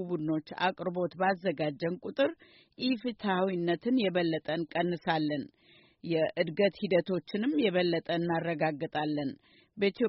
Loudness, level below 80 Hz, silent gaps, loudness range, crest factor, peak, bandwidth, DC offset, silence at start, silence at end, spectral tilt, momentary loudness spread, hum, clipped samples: -31 LUFS; -72 dBFS; none; 2 LU; 16 dB; -14 dBFS; 5.8 kHz; under 0.1%; 0 s; 0 s; -4.5 dB/octave; 6 LU; none; under 0.1%